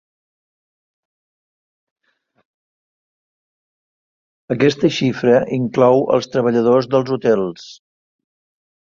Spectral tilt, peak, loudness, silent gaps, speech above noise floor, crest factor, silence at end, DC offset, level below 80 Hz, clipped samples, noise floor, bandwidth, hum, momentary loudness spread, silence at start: -6.5 dB/octave; -2 dBFS; -16 LUFS; none; over 74 dB; 18 dB; 1.1 s; under 0.1%; -60 dBFS; under 0.1%; under -90 dBFS; 7.4 kHz; none; 6 LU; 4.5 s